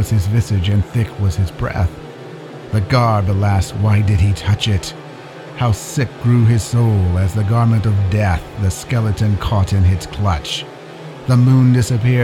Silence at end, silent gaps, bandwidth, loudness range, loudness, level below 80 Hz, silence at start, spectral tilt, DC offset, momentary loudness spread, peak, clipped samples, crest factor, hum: 0 s; none; 14 kHz; 2 LU; -16 LUFS; -32 dBFS; 0 s; -6.5 dB/octave; under 0.1%; 16 LU; 0 dBFS; under 0.1%; 14 dB; none